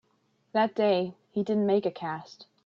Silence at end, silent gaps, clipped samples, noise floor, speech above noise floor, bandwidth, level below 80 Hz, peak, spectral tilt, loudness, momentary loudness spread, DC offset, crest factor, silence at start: 0.25 s; none; under 0.1%; -71 dBFS; 44 dB; 7 kHz; -76 dBFS; -14 dBFS; -7.5 dB/octave; -28 LUFS; 11 LU; under 0.1%; 16 dB; 0.55 s